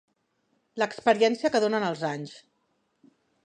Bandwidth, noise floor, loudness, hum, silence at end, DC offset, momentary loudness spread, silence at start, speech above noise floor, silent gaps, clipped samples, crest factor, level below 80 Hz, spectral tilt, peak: 9.8 kHz; -73 dBFS; -26 LUFS; none; 1.05 s; under 0.1%; 16 LU; 0.75 s; 48 dB; none; under 0.1%; 22 dB; -76 dBFS; -4.5 dB/octave; -6 dBFS